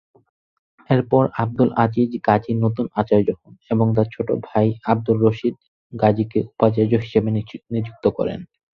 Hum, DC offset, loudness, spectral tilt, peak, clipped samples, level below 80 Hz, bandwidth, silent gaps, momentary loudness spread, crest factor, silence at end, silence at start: none; under 0.1%; -20 LUFS; -10.5 dB/octave; -2 dBFS; under 0.1%; -52 dBFS; 5.4 kHz; 5.68-5.90 s; 8 LU; 18 dB; 0.3 s; 0.9 s